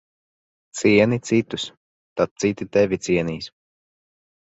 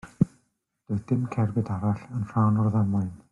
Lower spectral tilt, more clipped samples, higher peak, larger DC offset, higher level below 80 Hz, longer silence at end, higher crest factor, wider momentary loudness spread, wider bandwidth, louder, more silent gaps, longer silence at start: second, -5.5 dB/octave vs -10.5 dB/octave; neither; first, -4 dBFS vs -8 dBFS; neither; about the same, -54 dBFS vs -58 dBFS; first, 1.05 s vs 0.15 s; about the same, 20 dB vs 18 dB; first, 16 LU vs 7 LU; first, 8.2 kHz vs 7.2 kHz; first, -21 LUFS vs -27 LUFS; first, 1.77-2.16 s, 2.31-2.36 s vs none; first, 0.75 s vs 0.05 s